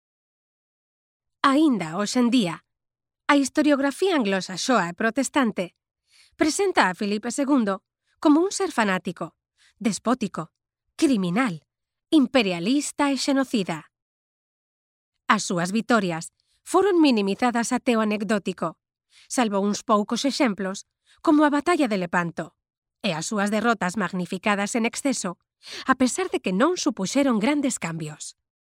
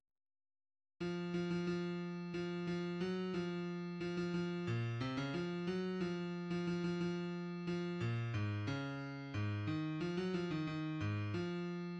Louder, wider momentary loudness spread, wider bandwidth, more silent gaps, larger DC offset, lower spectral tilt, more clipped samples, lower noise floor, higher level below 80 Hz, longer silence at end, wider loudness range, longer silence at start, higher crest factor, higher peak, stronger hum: first, -23 LUFS vs -41 LUFS; first, 12 LU vs 4 LU; first, 15.5 kHz vs 8.4 kHz; first, 14.02-15.12 s, 22.77-22.82 s vs none; neither; second, -4.5 dB/octave vs -7.5 dB/octave; neither; second, -86 dBFS vs under -90 dBFS; about the same, -66 dBFS vs -70 dBFS; first, 0.35 s vs 0 s; about the same, 3 LU vs 1 LU; first, 1.45 s vs 1 s; first, 24 dB vs 14 dB; first, 0 dBFS vs -28 dBFS; neither